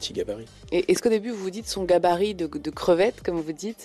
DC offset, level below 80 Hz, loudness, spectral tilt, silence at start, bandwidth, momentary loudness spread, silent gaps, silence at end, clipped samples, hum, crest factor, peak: under 0.1%; -52 dBFS; -25 LUFS; -4.5 dB/octave; 0 s; 13.5 kHz; 10 LU; none; 0 s; under 0.1%; none; 14 dB; -10 dBFS